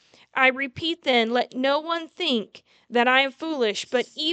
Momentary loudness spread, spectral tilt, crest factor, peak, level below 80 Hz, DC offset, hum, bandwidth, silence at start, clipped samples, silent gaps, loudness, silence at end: 8 LU; -3 dB/octave; 20 dB; -4 dBFS; -70 dBFS; under 0.1%; none; 9 kHz; 0.35 s; under 0.1%; none; -23 LUFS; 0 s